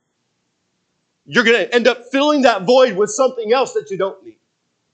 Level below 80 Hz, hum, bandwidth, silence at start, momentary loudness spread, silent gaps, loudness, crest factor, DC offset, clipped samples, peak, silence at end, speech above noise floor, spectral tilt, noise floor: -68 dBFS; none; 9 kHz; 1.3 s; 9 LU; none; -15 LUFS; 18 dB; under 0.1%; under 0.1%; 0 dBFS; 0.65 s; 54 dB; -3.5 dB/octave; -69 dBFS